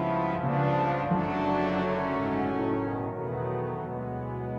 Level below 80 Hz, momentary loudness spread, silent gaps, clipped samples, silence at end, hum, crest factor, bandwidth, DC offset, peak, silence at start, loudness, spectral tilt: -52 dBFS; 8 LU; none; under 0.1%; 0 s; none; 14 dB; 7 kHz; under 0.1%; -16 dBFS; 0 s; -29 LUFS; -9 dB/octave